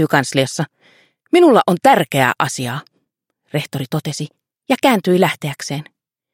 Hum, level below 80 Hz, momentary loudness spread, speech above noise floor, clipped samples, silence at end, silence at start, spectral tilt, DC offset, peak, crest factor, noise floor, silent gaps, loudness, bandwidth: none; -62 dBFS; 14 LU; 55 dB; under 0.1%; 0.5 s; 0 s; -5 dB/octave; under 0.1%; 0 dBFS; 18 dB; -71 dBFS; none; -16 LUFS; 16.5 kHz